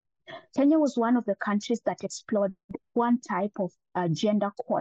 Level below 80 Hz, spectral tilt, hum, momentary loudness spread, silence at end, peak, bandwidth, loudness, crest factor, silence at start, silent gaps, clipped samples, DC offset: -72 dBFS; -6 dB/octave; none; 11 LU; 0 s; -14 dBFS; 8.4 kHz; -27 LUFS; 12 dB; 0.3 s; 2.64-2.69 s; under 0.1%; under 0.1%